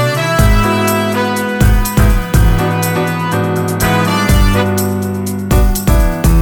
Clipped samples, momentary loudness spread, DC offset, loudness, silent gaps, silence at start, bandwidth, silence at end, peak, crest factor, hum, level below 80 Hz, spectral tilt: under 0.1%; 4 LU; under 0.1%; -13 LUFS; none; 0 s; over 20 kHz; 0 s; 0 dBFS; 12 dB; none; -16 dBFS; -5.5 dB/octave